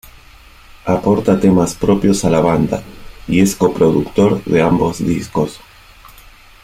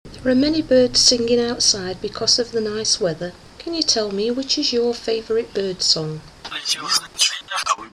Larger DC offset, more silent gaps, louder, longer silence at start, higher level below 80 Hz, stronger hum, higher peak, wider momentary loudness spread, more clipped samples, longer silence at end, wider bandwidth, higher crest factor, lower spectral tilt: neither; neither; first, -15 LUFS vs -18 LUFS; first, 0.85 s vs 0.05 s; first, -38 dBFS vs -48 dBFS; neither; about the same, -2 dBFS vs 0 dBFS; second, 7 LU vs 12 LU; neither; first, 0.35 s vs 0.05 s; about the same, 15.5 kHz vs 15.5 kHz; second, 14 dB vs 20 dB; first, -6.5 dB/octave vs -2.5 dB/octave